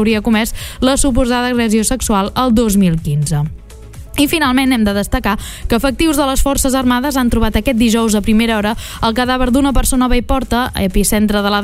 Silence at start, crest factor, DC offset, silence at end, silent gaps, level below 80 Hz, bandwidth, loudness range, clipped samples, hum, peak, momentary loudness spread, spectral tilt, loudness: 0 s; 12 dB; under 0.1%; 0 s; none; -22 dBFS; 16 kHz; 1 LU; under 0.1%; none; -2 dBFS; 5 LU; -4.5 dB/octave; -14 LUFS